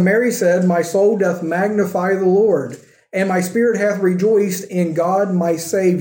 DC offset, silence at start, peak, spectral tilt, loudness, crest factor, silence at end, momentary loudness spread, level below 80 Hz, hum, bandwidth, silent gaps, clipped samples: under 0.1%; 0 s; -4 dBFS; -6.5 dB/octave; -17 LUFS; 12 dB; 0 s; 5 LU; -70 dBFS; none; 17 kHz; none; under 0.1%